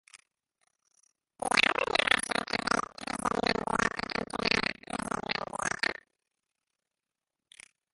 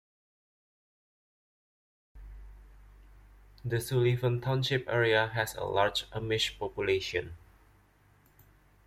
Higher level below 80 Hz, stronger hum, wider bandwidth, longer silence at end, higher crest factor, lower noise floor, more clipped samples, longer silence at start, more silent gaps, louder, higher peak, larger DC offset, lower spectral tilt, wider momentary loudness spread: about the same, -58 dBFS vs -56 dBFS; second, none vs 50 Hz at -65 dBFS; second, 12 kHz vs 15.5 kHz; first, 2 s vs 1.5 s; first, 28 dB vs 22 dB; first, -90 dBFS vs -64 dBFS; neither; second, 0.15 s vs 2.15 s; neither; about the same, -29 LUFS vs -30 LUFS; first, -6 dBFS vs -12 dBFS; neither; second, -2.5 dB/octave vs -5 dB/octave; about the same, 9 LU vs 10 LU